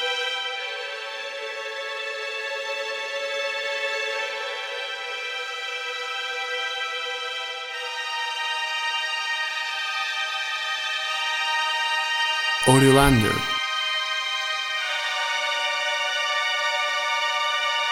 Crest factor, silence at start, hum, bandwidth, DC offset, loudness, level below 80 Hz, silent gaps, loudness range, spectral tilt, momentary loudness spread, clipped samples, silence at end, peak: 22 dB; 0 s; none; 17 kHz; under 0.1%; -24 LUFS; -46 dBFS; none; 7 LU; -3.5 dB/octave; 8 LU; under 0.1%; 0 s; -2 dBFS